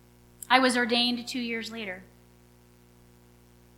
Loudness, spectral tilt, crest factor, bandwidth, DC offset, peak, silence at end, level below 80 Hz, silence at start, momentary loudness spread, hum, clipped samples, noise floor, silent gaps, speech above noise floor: -26 LUFS; -2.5 dB/octave; 28 dB; 17 kHz; under 0.1%; -2 dBFS; 1.75 s; -64 dBFS; 0.5 s; 17 LU; 60 Hz at -50 dBFS; under 0.1%; -57 dBFS; none; 31 dB